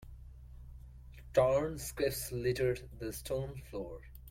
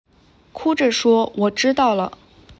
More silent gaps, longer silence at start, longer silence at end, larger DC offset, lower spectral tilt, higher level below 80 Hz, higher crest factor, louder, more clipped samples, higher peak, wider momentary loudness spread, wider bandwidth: neither; second, 0 s vs 0.55 s; about the same, 0 s vs 0.05 s; neither; about the same, -5 dB/octave vs -4 dB/octave; about the same, -52 dBFS vs -54 dBFS; first, 20 dB vs 14 dB; second, -35 LUFS vs -18 LUFS; neither; second, -16 dBFS vs -6 dBFS; first, 24 LU vs 7 LU; first, 16.5 kHz vs 8 kHz